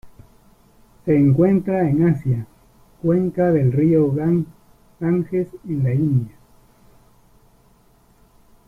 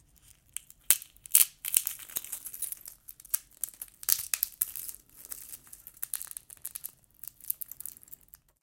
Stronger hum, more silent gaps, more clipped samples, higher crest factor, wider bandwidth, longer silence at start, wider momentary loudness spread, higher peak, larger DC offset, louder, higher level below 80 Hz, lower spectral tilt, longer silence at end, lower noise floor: neither; neither; neither; second, 16 dB vs 34 dB; second, 3.1 kHz vs 17 kHz; second, 0.05 s vs 0.9 s; second, 10 LU vs 21 LU; second, -4 dBFS vs 0 dBFS; neither; first, -19 LUFS vs -30 LUFS; first, -50 dBFS vs -68 dBFS; first, -11.5 dB/octave vs 2.5 dB/octave; first, 2.4 s vs 0.5 s; second, -55 dBFS vs -61 dBFS